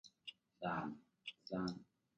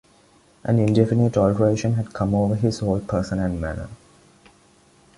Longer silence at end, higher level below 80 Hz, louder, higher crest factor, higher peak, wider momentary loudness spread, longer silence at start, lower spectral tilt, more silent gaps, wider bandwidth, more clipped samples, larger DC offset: second, 0.35 s vs 1.2 s; second, -76 dBFS vs -42 dBFS; second, -47 LUFS vs -21 LUFS; about the same, 18 dB vs 18 dB; second, -30 dBFS vs -4 dBFS; about the same, 12 LU vs 11 LU; second, 0.05 s vs 0.65 s; second, -6 dB/octave vs -8 dB/octave; neither; second, 8.8 kHz vs 11.5 kHz; neither; neither